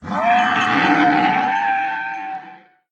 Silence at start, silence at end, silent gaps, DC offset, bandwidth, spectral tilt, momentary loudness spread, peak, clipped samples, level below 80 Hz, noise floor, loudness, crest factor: 0 s; 0.35 s; none; under 0.1%; 8.8 kHz; -5 dB/octave; 13 LU; -4 dBFS; under 0.1%; -58 dBFS; -43 dBFS; -17 LUFS; 16 dB